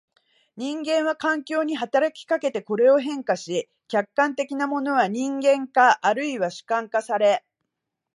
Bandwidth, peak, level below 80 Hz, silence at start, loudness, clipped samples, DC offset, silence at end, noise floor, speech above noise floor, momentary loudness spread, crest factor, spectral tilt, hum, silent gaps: 11.5 kHz; -4 dBFS; -80 dBFS; 0.55 s; -23 LUFS; under 0.1%; under 0.1%; 0.8 s; -82 dBFS; 60 dB; 9 LU; 18 dB; -4 dB/octave; none; none